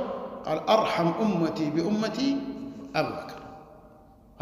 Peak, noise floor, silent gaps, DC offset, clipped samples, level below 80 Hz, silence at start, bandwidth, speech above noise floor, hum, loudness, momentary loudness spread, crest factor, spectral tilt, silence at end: -8 dBFS; -53 dBFS; none; under 0.1%; under 0.1%; -60 dBFS; 0 s; 15.5 kHz; 27 dB; none; -27 LUFS; 17 LU; 20 dB; -6 dB/octave; 0 s